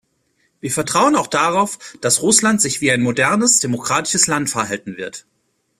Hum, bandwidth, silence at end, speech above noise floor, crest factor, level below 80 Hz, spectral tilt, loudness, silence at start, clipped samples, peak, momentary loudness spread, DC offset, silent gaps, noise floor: none; 15.5 kHz; 0.6 s; 47 dB; 18 dB; -56 dBFS; -2.5 dB/octave; -16 LUFS; 0.65 s; under 0.1%; 0 dBFS; 14 LU; under 0.1%; none; -64 dBFS